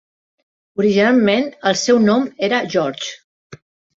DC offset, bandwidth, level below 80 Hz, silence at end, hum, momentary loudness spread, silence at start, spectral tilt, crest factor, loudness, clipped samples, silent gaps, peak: under 0.1%; 8 kHz; -62 dBFS; 0.4 s; none; 12 LU; 0.8 s; -4.5 dB/octave; 16 dB; -16 LUFS; under 0.1%; 3.24-3.50 s; -2 dBFS